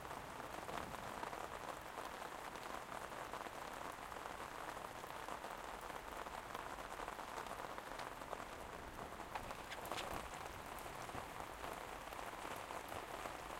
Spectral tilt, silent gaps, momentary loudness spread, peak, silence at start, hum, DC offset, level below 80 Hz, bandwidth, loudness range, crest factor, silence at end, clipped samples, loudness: -3 dB/octave; none; 2 LU; -28 dBFS; 0 s; none; under 0.1%; -64 dBFS; 16.5 kHz; 1 LU; 22 dB; 0 s; under 0.1%; -49 LUFS